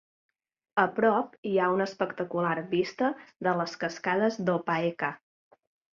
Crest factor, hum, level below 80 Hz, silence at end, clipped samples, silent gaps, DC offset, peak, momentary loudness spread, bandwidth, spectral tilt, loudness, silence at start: 20 dB; none; -74 dBFS; 0.75 s; under 0.1%; 1.38-1.43 s; under 0.1%; -10 dBFS; 7 LU; 7.4 kHz; -6 dB/octave; -29 LUFS; 0.75 s